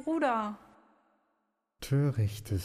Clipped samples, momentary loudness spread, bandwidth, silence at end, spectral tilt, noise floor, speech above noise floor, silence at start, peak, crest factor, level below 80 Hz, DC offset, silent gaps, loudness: under 0.1%; 15 LU; 15.5 kHz; 0 s; -7 dB/octave; -80 dBFS; 49 dB; 0 s; -18 dBFS; 14 dB; -56 dBFS; under 0.1%; none; -31 LUFS